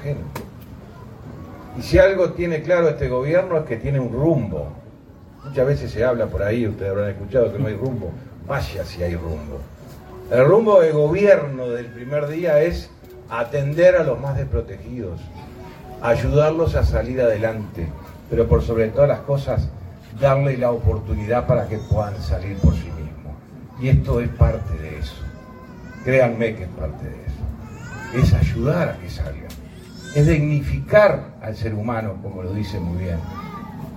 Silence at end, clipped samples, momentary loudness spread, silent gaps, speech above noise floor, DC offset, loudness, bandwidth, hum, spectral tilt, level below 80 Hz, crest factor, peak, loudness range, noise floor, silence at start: 0 s; under 0.1%; 22 LU; none; 24 dB; under 0.1%; -20 LUFS; 15.5 kHz; none; -8 dB/octave; -32 dBFS; 20 dB; 0 dBFS; 5 LU; -43 dBFS; 0 s